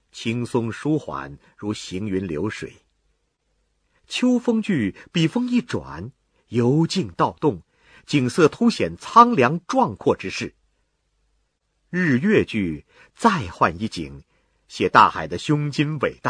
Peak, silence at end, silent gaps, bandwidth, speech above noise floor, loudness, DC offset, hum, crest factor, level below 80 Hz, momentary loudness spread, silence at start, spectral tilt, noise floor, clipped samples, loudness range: 0 dBFS; 0 s; none; 10.5 kHz; 49 dB; -21 LUFS; under 0.1%; none; 22 dB; -54 dBFS; 17 LU; 0.15 s; -6 dB/octave; -70 dBFS; under 0.1%; 8 LU